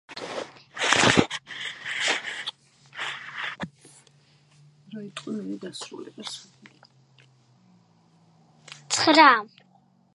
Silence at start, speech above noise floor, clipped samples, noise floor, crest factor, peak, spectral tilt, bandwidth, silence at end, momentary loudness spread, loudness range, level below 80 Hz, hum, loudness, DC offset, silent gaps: 0.1 s; 38 dB; under 0.1%; -61 dBFS; 26 dB; -2 dBFS; -2.5 dB/octave; 11.5 kHz; 0.7 s; 23 LU; 16 LU; -60 dBFS; none; -23 LUFS; under 0.1%; none